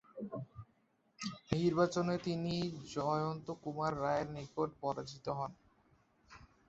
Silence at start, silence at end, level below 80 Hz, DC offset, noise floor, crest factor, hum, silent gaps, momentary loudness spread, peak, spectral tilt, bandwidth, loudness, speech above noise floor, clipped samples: 0.15 s; 0.25 s; -66 dBFS; under 0.1%; -75 dBFS; 22 dB; none; none; 12 LU; -18 dBFS; -6 dB/octave; 8 kHz; -38 LUFS; 38 dB; under 0.1%